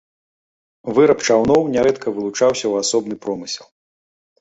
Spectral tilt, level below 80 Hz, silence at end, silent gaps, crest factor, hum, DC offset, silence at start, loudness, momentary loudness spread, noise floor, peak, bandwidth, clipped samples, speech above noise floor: -4 dB/octave; -52 dBFS; 0.75 s; none; 16 dB; none; under 0.1%; 0.85 s; -17 LUFS; 12 LU; under -90 dBFS; -2 dBFS; 8.2 kHz; under 0.1%; over 73 dB